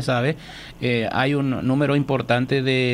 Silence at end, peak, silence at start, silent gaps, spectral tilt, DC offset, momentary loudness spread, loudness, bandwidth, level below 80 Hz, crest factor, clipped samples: 0 s; -6 dBFS; 0 s; none; -7 dB/octave; under 0.1%; 7 LU; -21 LUFS; 12 kHz; -50 dBFS; 16 dB; under 0.1%